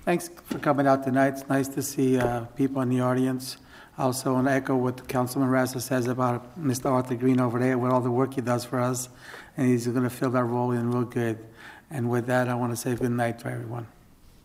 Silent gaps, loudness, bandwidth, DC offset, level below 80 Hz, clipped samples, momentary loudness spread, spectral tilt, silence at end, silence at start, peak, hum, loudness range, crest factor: none; -26 LUFS; 16 kHz; under 0.1%; -58 dBFS; under 0.1%; 11 LU; -6.5 dB/octave; 0.6 s; 0 s; -8 dBFS; none; 3 LU; 18 dB